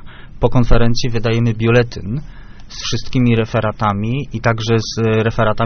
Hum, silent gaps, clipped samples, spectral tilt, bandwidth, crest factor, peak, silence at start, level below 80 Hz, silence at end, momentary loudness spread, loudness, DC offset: none; none; under 0.1%; -5.5 dB/octave; 6.6 kHz; 14 dB; 0 dBFS; 0 s; -26 dBFS; 0 s; 8 LU; -17 LUFS; under 0.1%